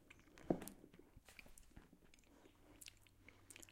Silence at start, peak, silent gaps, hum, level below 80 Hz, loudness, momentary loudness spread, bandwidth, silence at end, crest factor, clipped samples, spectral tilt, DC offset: 0 s; -22 dBFS; none; none; -70 dBFS; -52 LUFS; 23 LU; 16 kHz; 0 s; 32 dB; under 0.1%; -5 dB/octave; under 0.1%